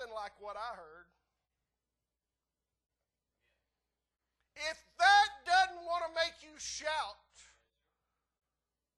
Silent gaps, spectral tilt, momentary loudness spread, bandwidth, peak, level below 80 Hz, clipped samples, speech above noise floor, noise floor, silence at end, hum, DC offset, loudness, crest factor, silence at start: none; 0.5 dB/octave; 19 LU; 12 kHz; -16 dBFS; -70 dBFS; under 0.1%; over 56 dB; under -90 dBFS; 1.85 s; none; under 0.1%; -32 LUFS; 22 dB; 0 s